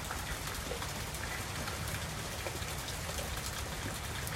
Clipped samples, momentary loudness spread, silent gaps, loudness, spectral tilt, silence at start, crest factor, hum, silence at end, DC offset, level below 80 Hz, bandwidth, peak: under 0.1%; 1 LU; none; -38 LUFS; -3 dB/octave; 0 s; 20 dB; none; 0 s; under 0.1%; -46 dBFS; 16.5 kHz; -20 dBFS